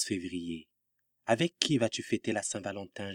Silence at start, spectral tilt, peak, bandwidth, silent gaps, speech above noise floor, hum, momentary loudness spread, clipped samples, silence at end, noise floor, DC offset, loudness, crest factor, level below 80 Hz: 0 s; -4 dB/octave; -4 dBFS; 16 kHz; none; 48 dB; none; 13 LU; under 0.1%; 0 s; -80 dBFS; under 0.1%; -32 LUFS; 30 dB; -72 dBFS